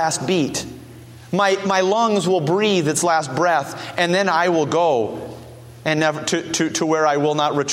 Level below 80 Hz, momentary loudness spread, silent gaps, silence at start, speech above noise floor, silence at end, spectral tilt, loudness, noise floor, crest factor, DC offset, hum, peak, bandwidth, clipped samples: -56 dBFS; 10 LU; none; 0 s; 21 dB; 0 s; -4 dB/octave; -19 LUFS; -40 dBFS; 18 dB; under 0.1%; none; -2 dBFS; 16 kHz; under 0.1%